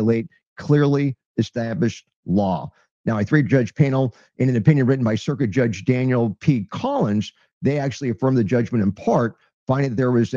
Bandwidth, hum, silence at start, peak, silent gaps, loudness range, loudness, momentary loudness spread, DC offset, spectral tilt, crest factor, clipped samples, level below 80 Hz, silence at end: 7.4 kHz; none; 0 s; -2 dBFS; 0.47-0.56 s, 1.26-1.35 s, 2.16-2.23 s, 2.91-3.04 s, 7.53-7.61 s, 9.53-9.67 s; 2 LU; -21 LUFS; 8 LU; under 0.1%; -8 dB/octave; 18 dB; under 0.1%; -56 dBFS; 0 s